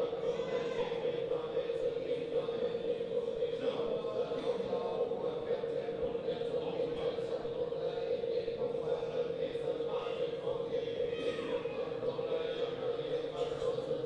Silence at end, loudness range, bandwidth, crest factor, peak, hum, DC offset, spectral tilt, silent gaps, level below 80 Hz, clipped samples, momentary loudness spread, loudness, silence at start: 0 s; 1 LU; 9 kHz; 14 dB; -22 dBFS; none; under 0.1%; -6 dB/octave; none; -64 dBFS; under 0.1%; 2 LU; -36 LUFS; 0 s